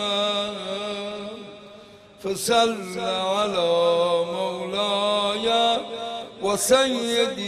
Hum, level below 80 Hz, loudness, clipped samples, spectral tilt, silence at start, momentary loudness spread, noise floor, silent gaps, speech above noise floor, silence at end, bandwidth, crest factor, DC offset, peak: none; -62 dBFS; -23 LUFS; under 0.1%; -2.5 dB/octave; 0 s; 13 LU; -46 dBFS; none; 24 dB; 0 s; 14.5 kHz; 18 dB; under 0.1%; -6 dBFS